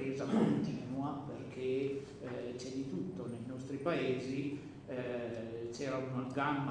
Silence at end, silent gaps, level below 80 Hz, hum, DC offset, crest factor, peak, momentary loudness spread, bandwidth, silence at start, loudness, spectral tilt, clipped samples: 0 s; none; -68 dBFS; none; under 0.1%; 18 dB; -20 dBFS; 10 LU; 10 kHz; 0 s; -39 LUFS; -7 dB/octave; under 0.1%